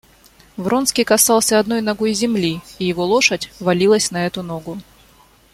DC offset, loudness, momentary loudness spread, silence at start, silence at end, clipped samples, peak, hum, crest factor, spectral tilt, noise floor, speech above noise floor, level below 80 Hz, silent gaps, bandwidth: under 0.1%; -17 LUFS; 14 LU; 0.55 s; 0.7 s; under 0.1%; 0 dBFS; none; 18 dB; -3.5 dB/octave; -50 dBFS; 33 dB; -52 dBFS; none; 16.5 kHz